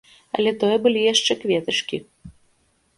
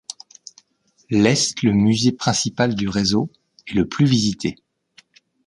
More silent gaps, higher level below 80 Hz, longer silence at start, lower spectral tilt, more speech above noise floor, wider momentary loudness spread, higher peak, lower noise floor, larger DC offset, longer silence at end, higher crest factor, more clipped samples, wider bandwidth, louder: neither; second, -60 dBFS vs -48 dBFS; second, 0.35 s vs 1.1 s; second, -3 dB/octave vs -4.5 dB/octave; about the same, 44 dB vs 44 dB; about the same, 12 LU vs 12 LU; about the same, -4 dBFS vs -2 dBFS; about the same, -64 dBFS vs -62 dBFS; neither; second, 0.65 s vs 0.95 s; about the same, 18 dB vs 18 dB; neither; about the same, 11.5 kHz vs 11.5 kHz; about the same, -20 LUFS vs -19 LUFS